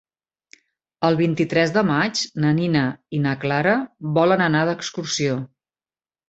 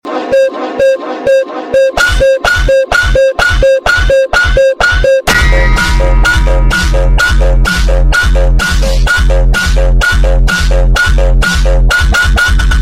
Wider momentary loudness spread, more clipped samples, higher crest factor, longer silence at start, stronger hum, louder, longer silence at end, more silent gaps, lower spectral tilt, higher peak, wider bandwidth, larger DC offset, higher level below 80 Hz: first, 6 LU vs 3 LU; neither; first, 18 dB vs 8 dB; first, 1 s vs 0.05 s; neither; second, -21 LUFS vs -9 LUFS; first, 0.85 s vs 0 s; neither; about the same, -5.5 dB/octave vs -4.5 dB/octave; second, -4 dBFS vs 0 dBFS; second, 8.2 kHz vs 14.5 kHz; neither; second, -60 dBFS vs -10 dBFS